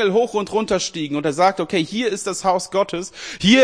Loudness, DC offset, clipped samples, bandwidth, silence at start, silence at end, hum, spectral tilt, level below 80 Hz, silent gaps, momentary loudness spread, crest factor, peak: -20 LUFS; 0.1%; under 0.1%; 10.5 kHz; 0 s; 0 s; none; -4 dB/octave; -52 dBFS; none; 6 LU; 18 dB; -2 dBFS